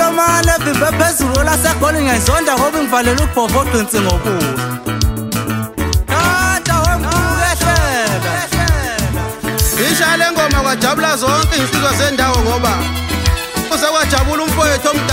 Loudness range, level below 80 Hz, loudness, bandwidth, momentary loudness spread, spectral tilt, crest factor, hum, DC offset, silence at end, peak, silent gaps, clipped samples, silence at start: 3 LU; -22 dBFS; -14 LUFS; 16.5 kHz; 5 LU; -4 dB/octave; 12 dB; none; under 0.1%; 0 s; 0 dBFS; none; under 0.1%; 0 s